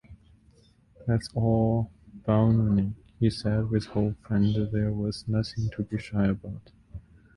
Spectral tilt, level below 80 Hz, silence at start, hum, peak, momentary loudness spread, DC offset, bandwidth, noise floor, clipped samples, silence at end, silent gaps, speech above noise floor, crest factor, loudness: -8.5 dB/octave; -46 dBFS; 0.1 s; none; -10 dBFS; 13 LU; under 0.1%; 11 kHz; -59 dBFS; under 0.1%; 0.35 s; none; 34 dB; 18 dB; -27 LUFS